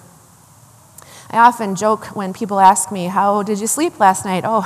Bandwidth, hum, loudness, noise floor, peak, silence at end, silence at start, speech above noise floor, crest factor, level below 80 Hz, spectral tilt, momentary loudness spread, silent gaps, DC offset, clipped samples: 15 kHz; none; -15 LUFS; -46 dBFS; 0 dBFS; 0 s; 1.15 s; 31 dB; 16 dB; -62 dBFS; -4 dB/octave; 9 LU; none; under 0.1%; 0.2%